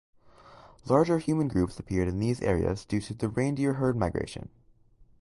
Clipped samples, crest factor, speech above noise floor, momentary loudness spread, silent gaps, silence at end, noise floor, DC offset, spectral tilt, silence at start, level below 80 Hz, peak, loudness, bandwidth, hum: under 0.1%; 20 dB; 31 dB; 10 LU; none; 0.75 s; -59 dBFS; under 0.1%; -7.5 dB/octave; 0.5 s; -46 dBFS; -10 dBFS; -28 LUFS; 11.5 kHz; none